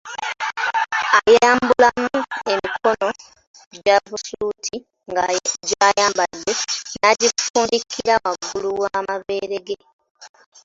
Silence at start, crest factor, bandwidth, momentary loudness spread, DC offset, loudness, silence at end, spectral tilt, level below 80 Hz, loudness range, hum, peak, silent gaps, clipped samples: 0.05 s; 18 dB; 8 kHz; 12 LU; under 0.1%; -19 LUFS; 0.4 s; -1.5 dB/octave; -56 dBFS; 5 LU; none; -2 dBFS; 3.47-3.54 s, 3.67-3.71 s, 7.50-7.54 s, 9.93-9.99 s, 10.10-10.15 s; under 0.1%